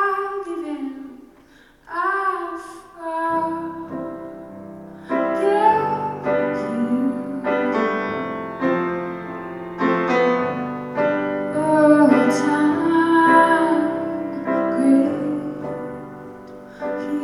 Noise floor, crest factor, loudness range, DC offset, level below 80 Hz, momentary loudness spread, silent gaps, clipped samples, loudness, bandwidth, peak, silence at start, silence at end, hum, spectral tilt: -51 dBFS; 18 dB; 9 LU; under 0.1%; -58 dBFS; 19 LU; none; under 0.1%; -20 LUFS; 12 kHz; -2 dBFS; 0 s; 0 s; none; -6.5 dB/octave